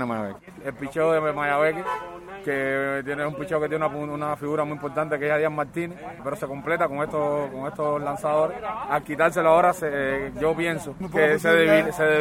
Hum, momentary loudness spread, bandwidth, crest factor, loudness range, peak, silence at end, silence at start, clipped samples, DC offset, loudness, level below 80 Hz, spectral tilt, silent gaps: none; 13 LU; 16.5 kHz; 20 dB; 5 LU; -4 dBFS; 0 s; 0 s; under 0.1%; under 0.1%; -24 LUFS; -54 dBFS; -5.5 dB/octave; none